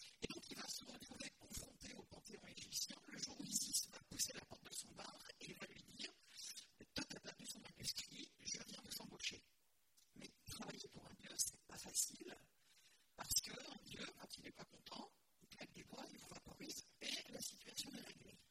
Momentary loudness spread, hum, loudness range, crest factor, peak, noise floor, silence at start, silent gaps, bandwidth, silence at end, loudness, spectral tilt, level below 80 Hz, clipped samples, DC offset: 16 LU; none; 7 LU; 28 dB; -26 dBFS; -81 dBFS; 0 s; none; 16 kHz; 0.05 s; -49 LUFS; -1 dB/octave; -74 dBFS; under 0.1%; under 0.1%